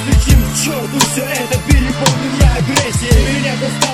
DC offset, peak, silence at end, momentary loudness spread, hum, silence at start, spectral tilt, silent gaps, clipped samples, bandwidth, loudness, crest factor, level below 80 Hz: under 0.1%; 0 dBFS; 0 s; 5 LU; none; 0 s; -4.5 dB/octave; none; under 0.1%; 18 kHz; -14 LUFS; 12 dB; -18 dBFS